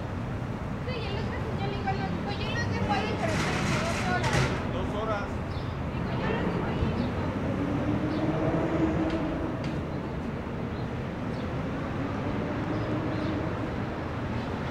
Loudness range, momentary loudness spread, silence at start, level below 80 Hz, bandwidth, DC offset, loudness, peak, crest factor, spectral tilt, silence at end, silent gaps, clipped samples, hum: 4 LU; 6 LU; 0 s; -42 dBFS; 13 kHz; under 0.1%; -30 LUFS; -12 dBFS; 16 dB; -6.5 dB/octave; 0 s; none; under 0.1%; none